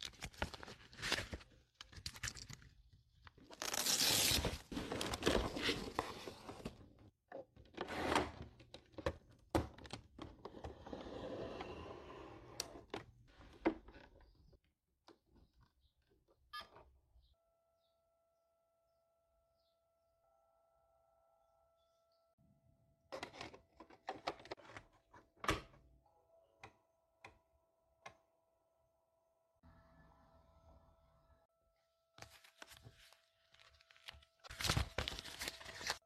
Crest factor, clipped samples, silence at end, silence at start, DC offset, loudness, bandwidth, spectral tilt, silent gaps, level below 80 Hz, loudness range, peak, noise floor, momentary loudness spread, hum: 28 dB; under 0.1%; 0.05 s; 0 s; under 0.1%; -42 LUFS; 14 kHz; -2.5 dB/octave; 22.33-22.38 s, 31.45-31.49 s; -60 dBFS; 24 LU; -18 dBFS; -83 dBFS; 23 LU; none